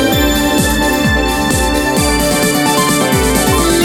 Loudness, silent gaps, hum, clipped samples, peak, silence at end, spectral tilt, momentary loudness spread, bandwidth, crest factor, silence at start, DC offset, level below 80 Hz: -12 LUFS; none; none; under 0.1%; 0 dBFS; 0 s; -3.5 dB/octave; 2 LU; 17.5 kHz; 12 dB; 0 s; under 0.1%; -22 dBFS